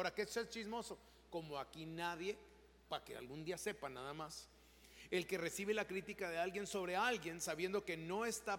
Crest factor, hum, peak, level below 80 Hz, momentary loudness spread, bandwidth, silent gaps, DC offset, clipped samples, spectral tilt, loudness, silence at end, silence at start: 20 dB; none; -24 dBFS; -72 dBFS; 11 LU; 17 kHz; none; under 0.1%; under 0.1%; -3.5 dB/octave; -44 LUFS; 0 s; 0 s